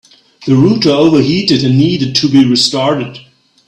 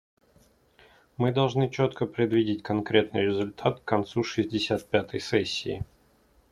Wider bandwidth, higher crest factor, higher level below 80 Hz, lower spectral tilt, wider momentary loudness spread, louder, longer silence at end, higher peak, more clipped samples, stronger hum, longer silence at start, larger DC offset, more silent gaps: second, 10.5 kHz vs 13.5 kHz; second, 12 dB vs 22 dB; first, -48 dBFS vs -58 dBFS; about the same, -5.5 dB/octave vs -6 dB/octave; about the same, 7 LU vs 5 LU; first, -10 LUFS vs -27 LUFS; second, 0.5 s vs 0.65 s; first, 0 dBFS vs -6 dBFS; neither; neither; second, 0.4 s vs 1.2 s; neither; neither